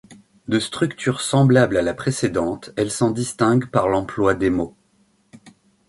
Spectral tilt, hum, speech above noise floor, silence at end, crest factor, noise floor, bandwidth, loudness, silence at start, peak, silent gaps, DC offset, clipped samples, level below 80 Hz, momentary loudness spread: -5.5 dB/octave; none; 42 dB; 0.4 s; 20 dB; -61 dBFS; 11.5 kHz; -20 LUFS; 0.1 s; -2 dBFS; none; under 0.1%; under 0.1%; -48 dBFS; 9 LU